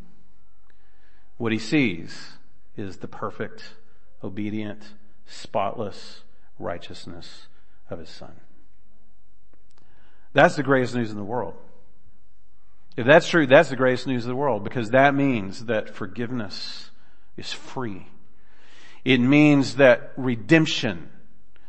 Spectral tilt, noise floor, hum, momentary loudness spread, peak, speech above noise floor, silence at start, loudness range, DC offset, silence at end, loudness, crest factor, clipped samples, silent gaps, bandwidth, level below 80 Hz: -6 dB/octave; -63 dBFS; none; 24 LU; -2 dBFS; 41 dB; 1.4 s; 15 LU; 3%; 0.65 s; -22 LUFS; 24 dB; under 0.1%; none; 8.8 kHz; -62 dBFS